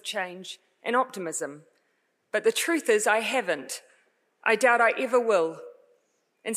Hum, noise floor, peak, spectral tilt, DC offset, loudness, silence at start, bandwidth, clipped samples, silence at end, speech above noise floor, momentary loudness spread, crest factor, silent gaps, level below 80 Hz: none; -73 dBFS; -8 dBFS; -2 dB/octave; under 0.1%; -25 LUFS; 0.05 s; 15.5 kHz; under 0.1%; 0 s; 47 dB; 16 LU; 20 dB; none; under -90 dBFS